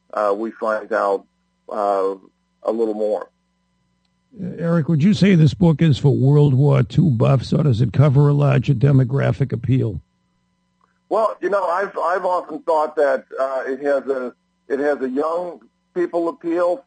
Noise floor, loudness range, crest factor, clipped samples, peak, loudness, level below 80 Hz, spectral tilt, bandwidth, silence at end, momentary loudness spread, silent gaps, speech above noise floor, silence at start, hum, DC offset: -67 dBFS; 8 LU; 14 dB; under 0.1%; -4 dBFS; -19 LUFS; -48 dBFS; -8.5 dB/octave; 8.8 kHz; 0.05 s; 11 LU; none; 49 dB; 0.15 s; none; under 0.1%